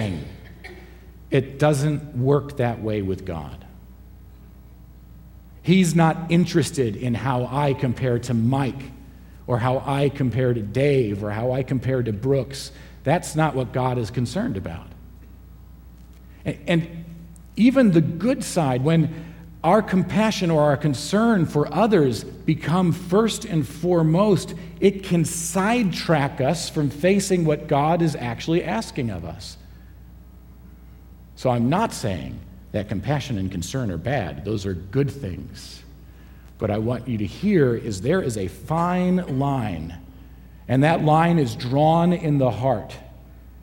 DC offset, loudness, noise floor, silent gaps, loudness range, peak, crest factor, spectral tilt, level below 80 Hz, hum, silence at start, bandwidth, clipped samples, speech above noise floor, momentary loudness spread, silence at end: under 0.1%; -22 LUFS; -44 dBFS; none; 7 LU; -4 dBFS; 18 dB; -6.5 dB/octave; -44 dBFS; none; 0 s; 16.5 kHz; under 0.1%; 23 dB; 15 LU; 0 s